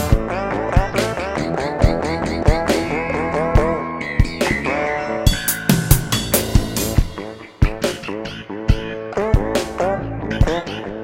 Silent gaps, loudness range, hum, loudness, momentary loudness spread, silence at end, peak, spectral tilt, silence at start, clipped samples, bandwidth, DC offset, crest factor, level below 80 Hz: none; 3 LU; none; -20 LUFS; 7 LU; 0 s; 0 dBFS; -5 dB/octave; 0 s; under 0.1%; 17 kHz; under 0.1%; 18 dB; -24 dBFS